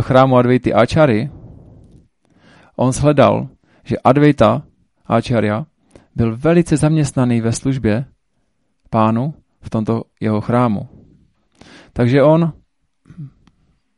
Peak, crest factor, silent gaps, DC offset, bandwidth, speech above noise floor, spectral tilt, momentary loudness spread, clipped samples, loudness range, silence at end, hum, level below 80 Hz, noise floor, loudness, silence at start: 0 dBFS; 16 dB; none; under 0.1%; 11.5 kHz; 53 dB; -7 dB/octave; 19 LU; under 0.1%; 4 LU; 0.7 s; none; -42 dBFS; -67 dBFS; -15 LUFS; 0 s